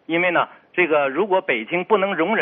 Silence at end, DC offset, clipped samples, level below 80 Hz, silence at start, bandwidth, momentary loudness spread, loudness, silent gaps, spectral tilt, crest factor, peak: 0 s; under 0.1%; under 0.1%; -68 dBFS; 0.1 s; 3.8 kHz; 4 LU; -20 LUFS; none; -2.5 dB/octave; 16 dB; -4 dBFS